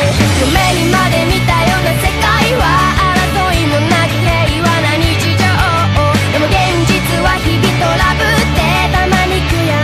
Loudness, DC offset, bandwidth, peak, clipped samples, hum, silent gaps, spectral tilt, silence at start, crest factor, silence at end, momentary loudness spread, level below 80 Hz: -11 LUFS; under 0.1%; 16 kHz; -2 dBFS; under 0.1%; none; none; -5 dB/octave; 0 s; 10 dB; 0 s; 2 LU; -22 dBFS